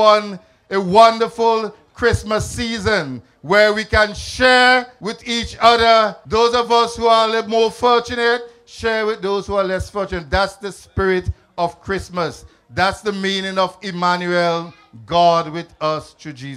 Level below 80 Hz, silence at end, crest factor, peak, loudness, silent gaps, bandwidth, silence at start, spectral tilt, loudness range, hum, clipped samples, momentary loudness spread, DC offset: -40 dBFS; 0 s; 18 dB; 0 dBFS; -17 LUFS; none; 13 kHz; 0 s; -4 dB/octave; 7 LU; none; under 0.1%; 14 LU; under 0.1%